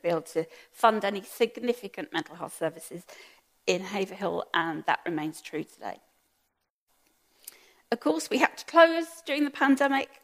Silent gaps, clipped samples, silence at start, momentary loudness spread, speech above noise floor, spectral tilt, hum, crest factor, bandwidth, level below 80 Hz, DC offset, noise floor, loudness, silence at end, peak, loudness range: 6.70-6.87 s; under 0.1%; 0.05 s; 18 LU; 50 dB; -4 dB/octave; none; 26 dB; 15.5 kHz; -80 dBFS; under 0.1%; -78 dBFS; -28 LUFS; 0.2 s; -4 dBFS; 9 LU